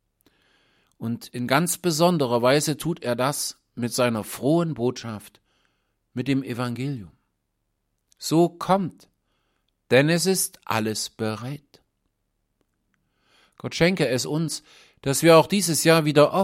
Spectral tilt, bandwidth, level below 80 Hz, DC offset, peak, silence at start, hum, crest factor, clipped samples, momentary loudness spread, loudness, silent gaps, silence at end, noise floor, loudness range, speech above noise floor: -4.5 dB/octave; 16.5 kHz; -62 dBFS; under 0.1%; -2 dBFS; 1 s; none; 22 dB; under 0.1%; 15 LU; -23 LUFS; none; 0 s; -76 dBFS; 7 LU; 53 dB